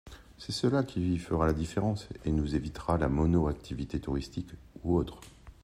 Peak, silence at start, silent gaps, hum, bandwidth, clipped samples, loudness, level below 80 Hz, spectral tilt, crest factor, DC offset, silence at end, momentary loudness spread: -14 dBFS; 0.05 s; none; none; 12 kHz; under 0.1%; -31 LUFS; -44 dBFS; -7 dB/octave; 16 dB; under 0.1%; 0.15 s; 13 LU